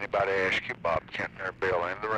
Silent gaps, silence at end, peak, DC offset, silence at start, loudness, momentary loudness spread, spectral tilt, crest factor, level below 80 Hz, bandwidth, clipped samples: none; 0 s; -16 dBFS; under 0.1%; 0 s; -29 LUFS; 7 LU; -5 dB/octave; 14 dB; -56 dBFS; 10 kHz; under 0.1%